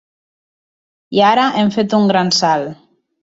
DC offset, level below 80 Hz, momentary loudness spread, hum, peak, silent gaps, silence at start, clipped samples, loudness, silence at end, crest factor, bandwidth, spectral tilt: under 0.1%; -60 dBFS; 8 LU; none; -2 dBFS; none; 1.1 s; under 0.1%; -14 LUFS; 0.5 s; 14 dB; 7.8 kHz; -4.5 dB/octave